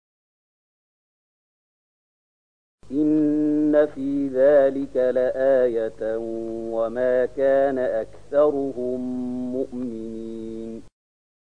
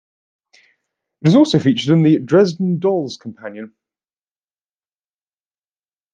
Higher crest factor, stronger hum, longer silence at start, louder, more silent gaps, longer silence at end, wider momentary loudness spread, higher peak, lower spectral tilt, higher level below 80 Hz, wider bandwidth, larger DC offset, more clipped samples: about the same, 16 dB vs 16 dB; first, 50 Hz at -55 dBFS vs none; first, 2.75 s vs 1.25 s; second, -22 LUFS vs -15 LUFS; neither; second, 0.55 s vs 2.45 s; second, 14 LU vs 19 LU; second, -8 dBFS vs -2 dBFS; about the same, -8 dB/octave vs -7 dB/octave; about the same, -58 dBFS vs -62 dBFS; about the same, 9.6 kHz vs 9 kHz; first, 0.7% vs under 0.1%; neither